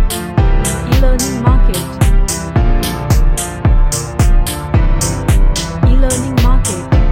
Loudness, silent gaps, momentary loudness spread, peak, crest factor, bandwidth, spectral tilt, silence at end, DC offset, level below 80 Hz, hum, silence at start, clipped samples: -14 LUFS; none; 3 LU; 0 dBFS; 10 dB; 16 kHz; -5 dB/octave; 0 s; under 0.1%; -12 dBFS; none; 0 s; under 0.1%